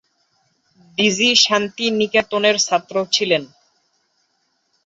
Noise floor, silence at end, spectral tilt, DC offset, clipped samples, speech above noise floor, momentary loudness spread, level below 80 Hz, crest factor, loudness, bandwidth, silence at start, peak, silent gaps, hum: -67 dBFS; 1.4 s; -2 dB/octave; under 0.1%; under 0.1%; 50 dB; 8 LU; -64 dBFS; 20 dB; -16 LUFS; 8 kHz; 1 s; -2 dBFS; none; none